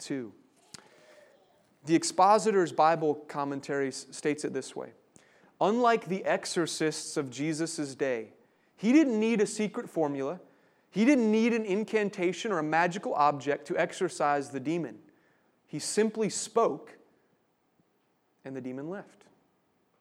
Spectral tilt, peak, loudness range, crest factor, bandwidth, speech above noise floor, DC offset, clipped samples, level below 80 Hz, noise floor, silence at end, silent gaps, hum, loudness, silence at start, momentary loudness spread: -4.5 dB/octave; -10 dBFS; 6 LU; 20 dB; 14 kHz; 44 dB; under 0.1%; under 0.1%; -86 dBFS; -72 dBFS; 0.95 s; none; none; -29 LUFS; 0 s; 15 LU